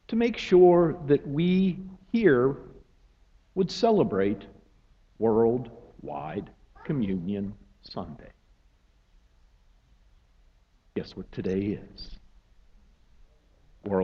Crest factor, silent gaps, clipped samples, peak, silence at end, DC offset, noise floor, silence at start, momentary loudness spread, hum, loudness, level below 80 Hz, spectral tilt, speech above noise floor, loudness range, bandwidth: 20 dB; none; under 0.1%; -8 dBFS; 0 s; under 0.1%; -62 dBFS; 0.1 s; 21 LU; none; -26 LUFS; -54 dBFS; -8 dB/octave; 37 dB; 17 LU; 7.4 kHz